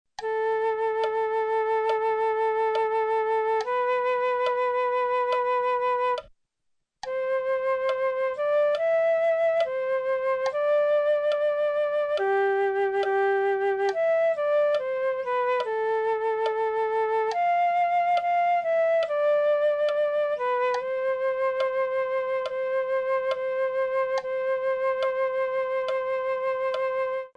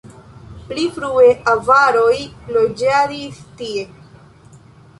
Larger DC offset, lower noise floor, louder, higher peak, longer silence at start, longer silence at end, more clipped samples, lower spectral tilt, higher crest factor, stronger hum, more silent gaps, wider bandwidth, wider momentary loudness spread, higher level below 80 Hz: neither; first, -76 dBFS vs -44 dBFS; second, -25 LUFS vs -15 LUFS; second, -14 dBFS vs -2 dBFS; first, 0.2 s vs 0.05 s; second, 0.1 s vs 1.15 s; neither; about the same, -3.5 dB/octave vs -4.5 dB/octave; second, 10 dB vs 16 dB; neither; neither; second, 8.8 kHz vs 11.5 kHz; second, 4 LU vs 17 LU; second, -70 dBFS vs -50 dBFS